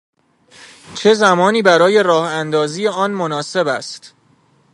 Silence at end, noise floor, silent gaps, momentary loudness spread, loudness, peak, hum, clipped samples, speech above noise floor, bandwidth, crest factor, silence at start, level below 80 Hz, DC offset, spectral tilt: 0.65 s; -55 dBFS; none; 11 LU; -15 LUFS; 0 dBFS; none; under 0.1%; 40 dB; 11.5 kHz; 16 dB; 0.6 s; -66 dBFS; under 0.1%; -4.5 dB/octave